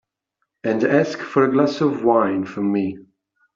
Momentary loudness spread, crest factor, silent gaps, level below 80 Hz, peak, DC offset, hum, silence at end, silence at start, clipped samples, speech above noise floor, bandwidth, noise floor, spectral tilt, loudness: 8 LU; 18 dB; none; -64 dBFS; -2 dBFS; under 0.1%; none; 0.55 s; 0.65 s; under 0.1%; 57 dB; 7.6 kHz; -76 dBFS; -7 dB/octave; -20 LUFS